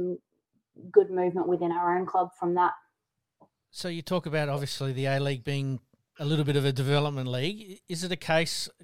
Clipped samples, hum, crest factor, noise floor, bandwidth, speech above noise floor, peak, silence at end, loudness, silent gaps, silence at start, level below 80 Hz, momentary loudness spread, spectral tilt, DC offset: under 0.1%; none; 22 dB; -83 dBFS; 16 kHz; 56 dB; -6 dBFS; 0 s; -28 LUFS; none; 0 s; -64 dBFS; 11 LU; -5.5 dB/octave; under 0.1%